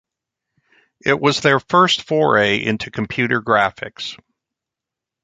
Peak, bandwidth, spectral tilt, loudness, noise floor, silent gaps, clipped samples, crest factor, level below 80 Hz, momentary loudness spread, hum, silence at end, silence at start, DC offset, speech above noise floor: -2 dBFS; 9.4 kHz; -4.5 dB/octave; -17 LUFS; -85 dBFS; none; under 0.1%; 18 dB; -54 dBFS; 12 LU; none; 1.1 s; 1.05 s; under 0.1%; 68 dB